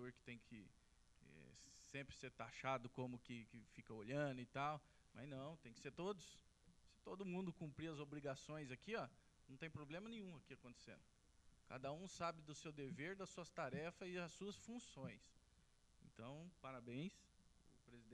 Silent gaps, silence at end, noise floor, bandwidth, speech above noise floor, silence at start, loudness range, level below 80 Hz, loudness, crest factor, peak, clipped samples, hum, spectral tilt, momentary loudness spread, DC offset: none; 0 s; -75 dBFS; 12.5 kHz; 22 dB; 0 s; 6 LU; -76 dBFS; -53 LUFS; 24 dB; -30 dBFS; under 0.1%; none; -5.5 dB/octave; 16 LU; under 0.1%